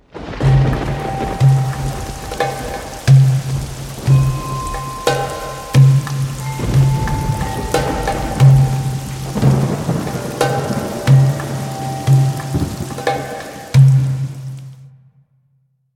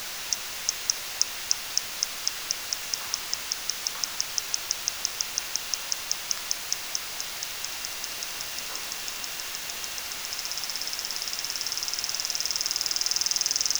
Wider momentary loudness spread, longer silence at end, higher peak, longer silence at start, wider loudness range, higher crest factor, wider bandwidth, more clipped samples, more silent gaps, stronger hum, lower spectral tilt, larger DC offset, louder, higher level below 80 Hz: first, 13 LU vs 6 LU; first, 1.05 s vs 0 s; about the same, 0 dBFS vs -2 dBFS; first, 0.15 s vs 0 s; about the same, 2 LU vs 4 LU; second, 16 dB vs 28 dB; second, 15 kHz vs over 20 kHz; neither; neither; neither; first, -6.5 dB/octave vs 2 dB/octave; neither; first, -16 LUFS vs -28 LUFS; first, -32 dBFS vs -62 dBFS